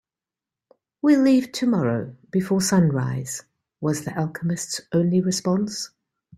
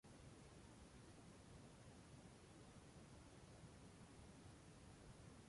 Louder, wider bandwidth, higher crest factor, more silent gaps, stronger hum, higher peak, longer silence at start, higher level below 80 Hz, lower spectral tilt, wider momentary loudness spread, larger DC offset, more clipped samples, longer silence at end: first, -22 LUFS vs -64 LUFS; first, 14.5 kHz vs 11.5 kHz; about the same, 16 dB vs 12 dB; neither; neither; first, -8 dBFS vs -50 dBFS; first, 1.05 s vs 0.05 s; first, -62 dBFS vs -72 dBFS; about the same, -5.5 dB/octave vs -5 dB/octave; first, 11 LU vs 1 LU; neither; neither; first, 0.5 s vs 0 s